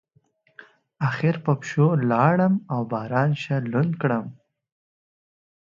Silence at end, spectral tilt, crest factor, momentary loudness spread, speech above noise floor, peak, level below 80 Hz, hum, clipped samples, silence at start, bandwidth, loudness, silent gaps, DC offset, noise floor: 1.3 s; -8 dB/octave; 20 dB; 8 LU; 42 dB; -4 dBFS; -66 dBFS; none; under 0.1%; 0.6 s; 7.4 kHz; -23 LUFS; none; under 0.1%; -64 dBFS